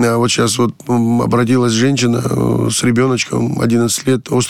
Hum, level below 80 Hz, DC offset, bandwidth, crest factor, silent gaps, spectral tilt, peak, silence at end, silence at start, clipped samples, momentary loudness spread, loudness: none; -44 dBFS; 0.4%; 14.5 kHz; 12 dB; none; -5 dB/octave; -2 dBFS; 0 s; 0 s; under 0.1%; 3 LU; -14 LUFS